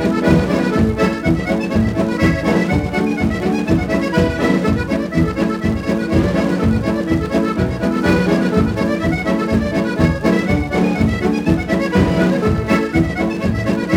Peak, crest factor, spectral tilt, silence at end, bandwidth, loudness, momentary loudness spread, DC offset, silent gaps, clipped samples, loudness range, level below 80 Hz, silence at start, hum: 0 dBFS; 16 dB; -7 dB/octave; 0 s; 16 kHz; -17 LUFS; 4 LU; under 0.1%; none; under 0.1%; 1 LU; -30 dBFS; 0 s; none